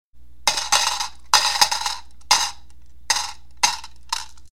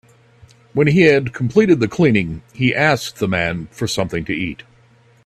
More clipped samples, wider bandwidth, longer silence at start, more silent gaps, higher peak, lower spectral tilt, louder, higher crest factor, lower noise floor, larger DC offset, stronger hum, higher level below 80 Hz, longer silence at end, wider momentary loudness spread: neither; first, 16.5 kHz vs 14 kHz; second, 0.05 s vs 0.75 s; neither; about the same, -2 dBFS vs 0 dBFS; second, 2 dB/octave vs -6 dB/octave; second, -20 LUFS vs -17 LUFS; about the same, 22 dB vs 18 dB; about the same, -50 dBFS vs -51 dBFS; first, 2% vs under 0.1%; first, 60 Hz at -50 dBFS vs none; about the same, -50 dBFS vs -48 dBFS; second, 0 s vs 0.7 s; about the same, 12 LU vs 12 LU